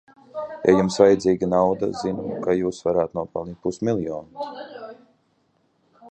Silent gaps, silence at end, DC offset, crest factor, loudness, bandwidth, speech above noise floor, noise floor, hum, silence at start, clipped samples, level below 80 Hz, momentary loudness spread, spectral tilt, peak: none; 0 s; under 0.1%; 20 dB; -22 LUFS; 9 kHz; 44 dB; -66 dBFS; none; 0.35 s; under 0.1%; -54 dBFS; 18 LU; -6.5 dB/octave; -2 dBFS